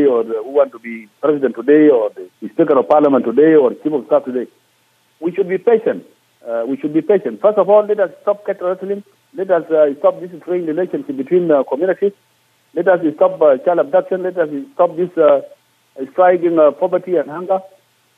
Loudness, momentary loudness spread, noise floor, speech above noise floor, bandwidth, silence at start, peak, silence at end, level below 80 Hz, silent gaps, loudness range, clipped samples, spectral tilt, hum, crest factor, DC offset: -15 LUFS; 13 LU; -58 dBFS; 43 dB; 4 kHz; 0 s; -2 dBFS; 0.5 s; -76 dBFS; none; 4 LU; under 0.1%; -8.5 dB/octave; none; 14 dB; under 0.1%